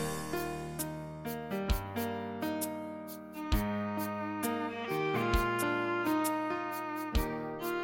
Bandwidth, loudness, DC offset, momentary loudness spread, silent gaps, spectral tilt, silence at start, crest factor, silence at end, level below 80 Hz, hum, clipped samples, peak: 17 kHz; -35 LUFS; under 0.1%; 9 LU; none; -5 dB/octave; 0 s; 18 dB; 0 s; -42 dBFS; none; under 0.1%; -16 dBFS